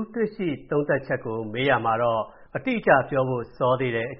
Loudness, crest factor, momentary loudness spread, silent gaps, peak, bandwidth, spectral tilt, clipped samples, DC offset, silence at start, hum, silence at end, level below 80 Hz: -24 LUFS; 20 dB; 9 LU; none; -4 dBFS; 5.6 kHz; -4.5 dB/octave; under 0.1%; under 0.1%; 0 s; none; 0 s; -54 dBFS